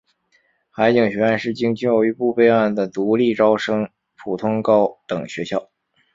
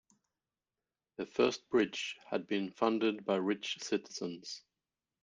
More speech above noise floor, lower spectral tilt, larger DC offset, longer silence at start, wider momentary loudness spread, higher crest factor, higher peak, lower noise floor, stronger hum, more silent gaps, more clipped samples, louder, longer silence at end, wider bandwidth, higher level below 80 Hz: second, 45 dB vs over 55 dB; first, -7 dB/octave vs -4 dB/octave; neither; second, 0.75 s vs 1.2 s; about the same, 12 LU vs 13 LU; about the same, 18 dB vs 22 dB; first, -2 dBFS vs -14 dBFS; second, -63 dBFS vs under -90 dBFS; neither; neither; neither; first, -19 LUFS vs -35 LUFS; second, 0.5 s vs 0.65 s; second, 7.6 kHz vs 9.6 kHz; first, -60 dBFS vs -78 dBFS